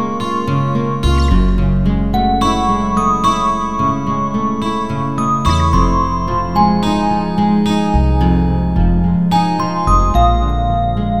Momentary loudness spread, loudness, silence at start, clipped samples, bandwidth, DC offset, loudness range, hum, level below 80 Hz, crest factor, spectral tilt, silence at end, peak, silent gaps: 5 LU; -15 LUFS; 0 s; under 0.1%; 12 kHz; 3%; 2 LU; none; -20 dBFS; 14 dB; -7 dB/octave; 0 s; 0 dBFS; none